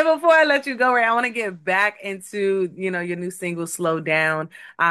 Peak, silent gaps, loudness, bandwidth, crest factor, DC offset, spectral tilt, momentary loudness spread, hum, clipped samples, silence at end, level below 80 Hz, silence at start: -6 dBFS; none; -20 LUFS; 12.5 kHz; 16 dB; under 0.1%; -4.5 dB/octave; 12 LU; none; under 0.1%; 0 s; -76 dBFS; 0 s